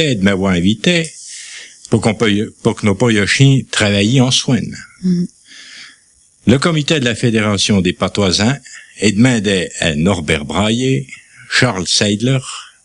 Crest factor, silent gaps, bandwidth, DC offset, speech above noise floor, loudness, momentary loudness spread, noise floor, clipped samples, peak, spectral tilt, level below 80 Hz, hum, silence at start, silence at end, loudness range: 14 dB; none; 11.5 kHz; under 0.1%; 37 dB; -14 LUFS; 14 LU; -51 dBFS; under 0.1%; 0 dBFS; -4.5 dB/octave; -44 dBFS; none; 0 s; 0.2 s; 2 LU